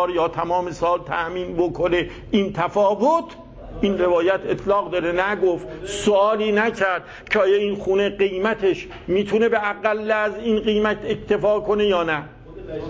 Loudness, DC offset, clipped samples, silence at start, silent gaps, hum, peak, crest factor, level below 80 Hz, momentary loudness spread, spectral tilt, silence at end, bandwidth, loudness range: -21 LUFS; under 0.1%; under 0.1%; 0 s; none; none; -4 dBFS; 16 dB; -46 dBFS; 7 LU; -5.5 dB/octave; 0 s; 8 kHz; 1 LU